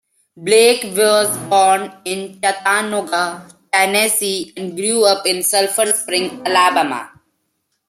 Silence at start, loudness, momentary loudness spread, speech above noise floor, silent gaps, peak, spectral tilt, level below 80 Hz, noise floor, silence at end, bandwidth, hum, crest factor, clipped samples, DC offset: 0.35 s; -15 LUFS; 10 LU; 54 dB; none; 0 dBFS; -1.5 dB/octave; -66 dBFS; -70 dBFS; 0.8 s; 16 kHz; none; 16 dB; under 0.1%; under 0.1%